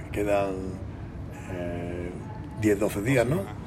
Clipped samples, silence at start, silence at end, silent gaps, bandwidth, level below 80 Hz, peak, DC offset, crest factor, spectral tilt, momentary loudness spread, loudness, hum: under 0.1%; 0 s; 0 s; none; 16 kHz; -44 dBFS; -10 dBFS; under 0.1%; 18 dB; -6.5 dB/octave; 14 LU; -28 LUFS; none